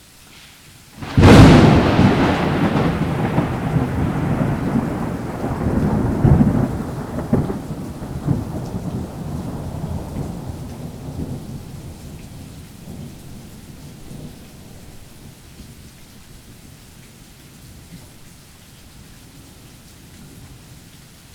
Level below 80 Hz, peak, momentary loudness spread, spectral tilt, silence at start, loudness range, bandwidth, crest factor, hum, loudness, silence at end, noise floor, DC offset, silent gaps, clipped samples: -32 dBFS; 0 dBFS; 25 LU; -7 dB/octave; 0.45 s; 26 LU; 17 kHz; 20 dB; none; -17 LUFS; 0.6 s; -44 dBFS; under 0.1%; none; under 0.1%